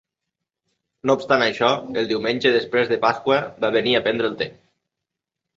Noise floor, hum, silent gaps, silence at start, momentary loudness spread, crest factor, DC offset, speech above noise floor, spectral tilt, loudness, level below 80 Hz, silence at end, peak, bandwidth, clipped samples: -84 dBFS; none; none; 1.05 s; 6 LU; 20 dB; under 0.1%; 64 dB; -5 dB/octave; -20 LUFS; -62 dBFS; 1.05 s; -2 dBFS; 7.6 kHz; under 0.1%